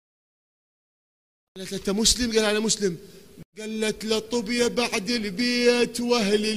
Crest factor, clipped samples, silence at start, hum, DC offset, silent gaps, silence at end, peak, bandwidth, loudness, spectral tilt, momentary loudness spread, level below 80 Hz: 20 dB; under 0.1%; 1.55 s; none; 0.3%; 3.45-3.53 s; 0 s; -6 dBFS; 15.5 kHz; -23 LUFS; -3 dB/octave; 12 LU; -48 dBFS